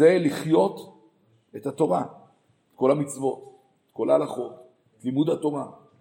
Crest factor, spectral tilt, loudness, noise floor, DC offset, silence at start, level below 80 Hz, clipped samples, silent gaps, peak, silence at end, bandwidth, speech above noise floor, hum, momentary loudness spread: 20 dB; -6.5 dB/octave; -25 LUFS; -63 dBFS; under 0.1%; 0 s; -76 dBFS; under 0.1%; none; -6 dBFS; 0.25 s; 16.5 kHz; 40 dB; none; 17 LU